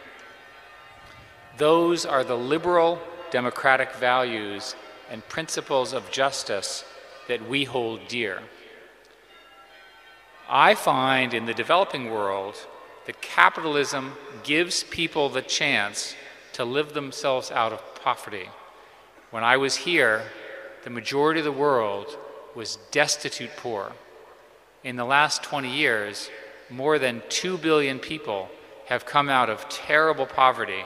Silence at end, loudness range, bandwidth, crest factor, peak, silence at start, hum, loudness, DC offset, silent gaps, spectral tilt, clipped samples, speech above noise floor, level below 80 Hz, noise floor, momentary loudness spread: 0 s; 5 LU; 15.5 kHz; 26 dB; 0 dBFS; 0 s; none; -24 LUFS; under 0.1%; none; -3 dB/octave; under 0.1%; 29 dB; -66 dBFS; -53 dBFS; 17 LU